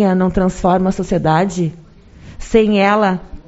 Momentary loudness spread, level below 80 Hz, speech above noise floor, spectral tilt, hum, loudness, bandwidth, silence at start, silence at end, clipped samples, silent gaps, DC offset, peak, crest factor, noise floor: 7 LU; -34 dBFS; 25 dB; -6 dB/octave; none; -15 LUFS; 8 kHz; 0 s; 0.05 s; under 0.1%; none; under 0.1%; 0 dBFS; 16 dB; -39 dBFS